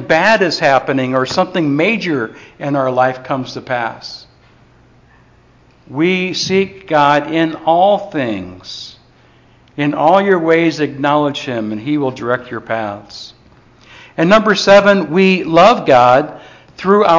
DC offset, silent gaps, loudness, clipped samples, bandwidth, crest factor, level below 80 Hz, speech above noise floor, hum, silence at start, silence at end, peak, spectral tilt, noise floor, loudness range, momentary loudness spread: under 0.1%; none; -13 LUFS; under 0.1%; 7.6 kHz; 14 dB; -52 dBFS; 35 dB; none; 0 s; 0 s; 0 dBFS; -5.5 dB/octave; -48 dBFS; 9 LU; 18 LU